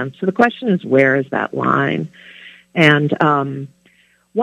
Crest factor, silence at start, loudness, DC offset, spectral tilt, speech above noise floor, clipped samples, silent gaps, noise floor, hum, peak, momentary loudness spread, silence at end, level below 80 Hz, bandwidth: 18 dB; 0 s; -16 LUFS; under 0.1%; -7 dB/octave; 39 dB; under 0.1%; none; -55 dBFS; 60 Hz at -45 dBFS; 0 dBFS; 13 LU; 0 s; -62 dBFS; 11 kHz